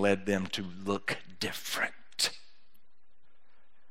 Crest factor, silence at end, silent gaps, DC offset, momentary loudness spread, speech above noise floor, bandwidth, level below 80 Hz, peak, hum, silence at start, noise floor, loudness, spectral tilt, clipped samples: 24 dB; 1.5 s; none; 0.7%; 6 LU; 42 dB; 16 kHz; -74 dBFS; -12 dBFS; none; 0 s; -74 dBFS; -33 LUFS; -3.5 dB/octave; under 0.1%